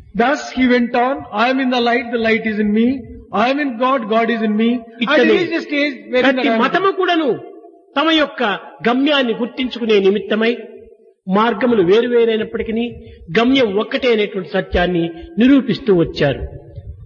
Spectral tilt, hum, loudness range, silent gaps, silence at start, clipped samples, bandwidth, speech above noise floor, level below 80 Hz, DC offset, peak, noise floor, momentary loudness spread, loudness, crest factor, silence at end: -6 dB/octave; none; 1 LU; none; 0.15 s; under 0.1%; 7.2 kHz; 27 dB; -42 dBFS; under 0.1%; -2 dBFS; -43 dBFS; 8 LU; -16 LUFS; 14 dB; 0 s